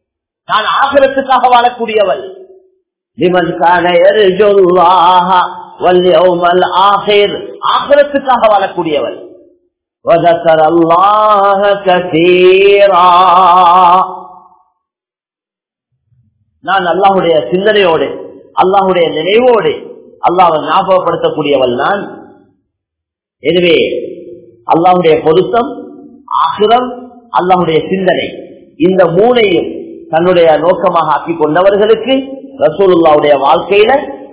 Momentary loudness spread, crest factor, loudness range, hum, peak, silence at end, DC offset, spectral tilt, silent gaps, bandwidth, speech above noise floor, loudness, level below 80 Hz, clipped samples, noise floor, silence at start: 12 LU; 10 dB; 6 LU; none; 0 dBFS; 0.05 s; under 0.1%; -9 dB/octave; none; 4 kHz; 82 dB; -9 LUFS; -48 dBFS; 3%; -90 dBFS; 0.5 s